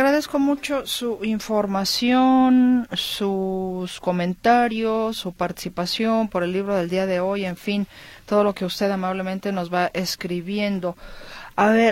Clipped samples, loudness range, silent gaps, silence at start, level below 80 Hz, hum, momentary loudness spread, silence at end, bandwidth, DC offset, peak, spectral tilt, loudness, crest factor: under 0.1%; 4 LU; none; 0 s; -52 dBFS; none; 10 LU; 0 s; 16.5 kHz; under 0.1%; -6 dBFS; -5 dB/octave; -22 LUFS; 16 dB